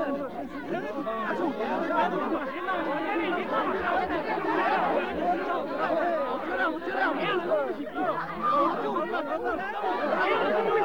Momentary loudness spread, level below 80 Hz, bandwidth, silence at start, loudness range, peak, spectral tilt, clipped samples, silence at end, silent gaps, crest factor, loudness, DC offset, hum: 6 LU; -60 dBFS; 19 kHz; 0 s; 1 LU; -14 dBFS; -6 dB/octave; under 0.1%; 0 s; none; 14 dB; -28 LUFS; 0.4%; none